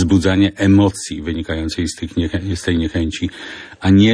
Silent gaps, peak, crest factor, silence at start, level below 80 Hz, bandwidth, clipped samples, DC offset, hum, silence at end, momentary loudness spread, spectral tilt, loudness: none; -2 dBFS; 14 dB; 0 s; -34 dBFS; 10.5 kHz; under 0.1%; under 0.1%; none; 0 s; 12 LU; -6 dB/octave; -17 LUFS